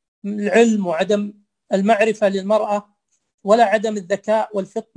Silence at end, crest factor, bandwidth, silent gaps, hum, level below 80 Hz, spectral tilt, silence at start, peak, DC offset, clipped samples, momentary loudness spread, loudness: 0.15 s; 18 dB; 10.5 kHz; 3.34-3.38 s; none; -68 dBFS; -5.5 dB/octave; 0.25 s; -2 dBFS; under 0.1%; under 0.1%; 10 LU; -18 LUFS